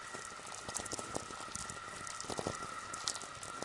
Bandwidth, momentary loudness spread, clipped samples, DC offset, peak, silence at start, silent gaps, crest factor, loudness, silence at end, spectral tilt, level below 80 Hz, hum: 11.5 kHz; 6 LU; under 0.1%; under 0.1%; -14 dBFS; 0 s; none; 30 dB; -42 LUFS; 0 s; -2 dB/octave; -66 dBFS; none